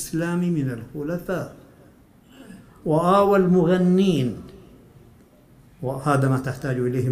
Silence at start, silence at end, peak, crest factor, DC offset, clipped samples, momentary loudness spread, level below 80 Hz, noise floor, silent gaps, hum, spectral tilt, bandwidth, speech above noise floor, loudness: 0 s; 0 s; -6 dBFS; 18 dB; under 0.1%; under 0.1%; 14 LU; -52 dBFS; -52 dBFS; none; none; -7.5 dB/octave; 15.5 kHz; 31 dB; -22 LUFS